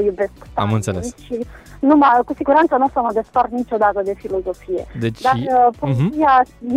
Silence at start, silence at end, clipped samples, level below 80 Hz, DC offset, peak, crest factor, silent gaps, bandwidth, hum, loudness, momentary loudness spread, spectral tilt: 0 s; 0 s; under 0.1%; -44 dBFS; under 0.1%; -2 dBFS; 14 dB; none; 13.5 kHz; none; -17 LUFS; 12 LU; -7 dB/octave